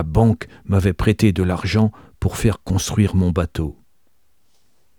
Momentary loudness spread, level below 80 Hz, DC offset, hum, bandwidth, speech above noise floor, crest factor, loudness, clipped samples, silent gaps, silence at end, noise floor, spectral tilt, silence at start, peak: 8 LU; -34 dBFS; 0.2%; none; 17.5 kHz; 49 dB; 18 dB; -19 LUFS; under 0.1%; none; 1.25 s; -67 dBFS; -6.5 dB/octave; 0 s; -2 dBFS